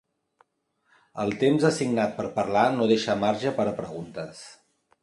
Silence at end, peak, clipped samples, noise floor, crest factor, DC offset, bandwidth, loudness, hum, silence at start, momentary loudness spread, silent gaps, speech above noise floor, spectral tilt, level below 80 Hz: 0.5 s; -6 dBFS; under 0.1%; -72 dBFS; 20 dB; under 0.1%; 11.5 kHz; -25 LUFS; none; 1.15 s; 17 LU; none; 47 dB; -5.5 dB/octave; -62 dBFS